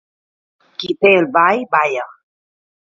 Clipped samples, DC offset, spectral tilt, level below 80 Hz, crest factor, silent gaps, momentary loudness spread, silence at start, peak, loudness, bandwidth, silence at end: under 0.1%; under 0.1%; -5.5 dB/octave; -64 dBFS; 18 dB; none; 18 LU; 0.8 s; 0 dBFS; -14 LUFS; 7.4 kHz; 0.8 s